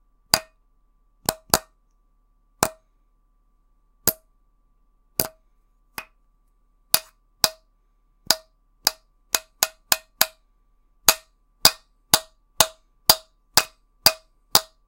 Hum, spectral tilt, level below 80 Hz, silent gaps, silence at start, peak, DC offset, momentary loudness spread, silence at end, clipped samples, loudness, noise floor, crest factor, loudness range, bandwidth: none; 0 dB/octave; -52 dBFS; none; 0.35 s; 0 dBFS; under 0.1%; 11 LU; 0.25 s; under 0.1%; -22 LUFS; -63 dBFS; 26 dB; 10 LU; 17 kHz